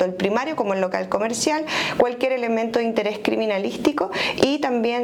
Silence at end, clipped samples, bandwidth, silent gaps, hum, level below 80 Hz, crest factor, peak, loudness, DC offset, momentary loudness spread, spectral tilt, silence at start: 0 s; under 0.1%; 18 kHz; none; none; -58 dBFS; 16 dB; -6 dBFS; -22 LUFS; under 0.1%; 3 LU; -4 dB/octave; 0 s